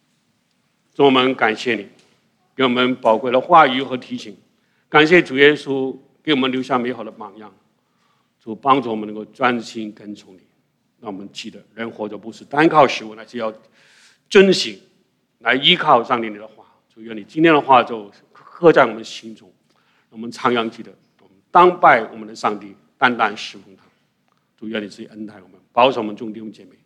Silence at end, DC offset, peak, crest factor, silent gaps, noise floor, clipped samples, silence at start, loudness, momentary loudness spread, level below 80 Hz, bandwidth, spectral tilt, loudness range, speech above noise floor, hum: 0.35 s; under 0.1%; 0 dBFS; 18 dB; none; -65 dBFS; under 0.1%; 1 s; -16 LUFS; 22 LU; -64 dBFS; 10.5 kHz; -5 dB/octave; 8 LU; 48 dB; none